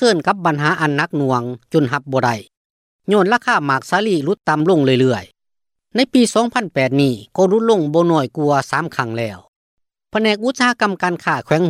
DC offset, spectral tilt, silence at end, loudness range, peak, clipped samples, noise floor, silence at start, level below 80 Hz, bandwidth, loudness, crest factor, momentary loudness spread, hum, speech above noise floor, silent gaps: under 0.1%; -5.5 dB/octave; 0 s; 2 LU; -2 dBFS; under 0.1%; -79 dBFS; 0 s; -60 dBFS; 15 kHz; -17 LUFS; 16 dB; 7 LU; none; 63 dB; 2.57-2.99 s, 9.48-9.77 s